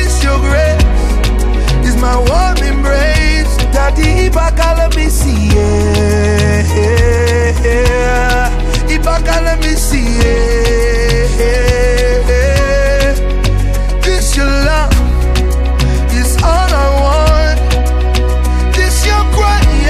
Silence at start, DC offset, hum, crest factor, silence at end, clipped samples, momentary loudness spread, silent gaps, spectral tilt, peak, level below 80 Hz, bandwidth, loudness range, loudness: 0 s; under 0.1%; none; 10 dB; 0 s; under 0.1%; 3 LU; none; -5 dB/octave; 0 dBFS; -12 dBFS; 14.5 kHz; 1 LU; -12 LUFS